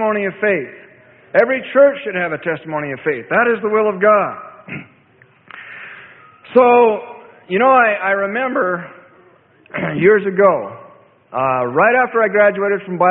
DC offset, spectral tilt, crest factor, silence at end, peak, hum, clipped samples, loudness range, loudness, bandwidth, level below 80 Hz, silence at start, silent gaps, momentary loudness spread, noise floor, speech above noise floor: under 0.1%; -10 dB/octave; 16 dB; 0 s; 0 dBFS; none; under 0.1%; 3 LU; -15 LUFS; 4.4 kHz; -62 dBFS; 0 s; none; 19 LU; -51 dBFS; 36 dB